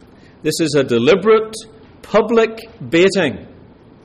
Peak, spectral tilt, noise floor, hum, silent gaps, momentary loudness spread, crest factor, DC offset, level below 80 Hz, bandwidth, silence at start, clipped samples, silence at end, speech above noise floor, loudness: -4 dBFS; -5 dB/octave; -43 dBFS; none; none; 15 LU; 14 dB; under 0.1%; -50 dBFS; 14 kHz; 0.45 s; under 0.1%; 0.6 s; 28 dB; -15 LUFS